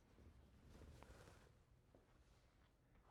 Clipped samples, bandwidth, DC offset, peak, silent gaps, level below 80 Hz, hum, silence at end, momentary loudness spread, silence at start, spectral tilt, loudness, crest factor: under 0.1%; 13.5 kHz; under 0.1%; -42 dBFS; none; -72 dBFS; none; 0 s; 5 LU; 0 s; -5.5 dB/octave; -66 LUFS; 26 dB